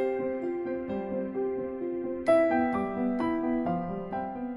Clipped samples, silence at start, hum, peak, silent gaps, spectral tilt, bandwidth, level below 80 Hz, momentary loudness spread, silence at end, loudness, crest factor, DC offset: under 0.1%; 0 s; none; -14 dBFS; none; -8.5 dB/octave; 11 kHz; -58 dBFS; 9 LU; 0 s; -30 LUFS; 16 dB; under 0.1%